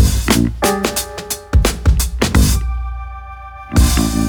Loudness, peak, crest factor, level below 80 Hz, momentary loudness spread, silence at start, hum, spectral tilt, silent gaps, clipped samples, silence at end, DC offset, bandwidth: -16 LUFS; 0 dBFS; 14 dB; -18 dBFS; 16 LU; 0 s; none; -4.5 dB/octave; none; under 0.1%; 0 s; under 0.1%; over 20 kHz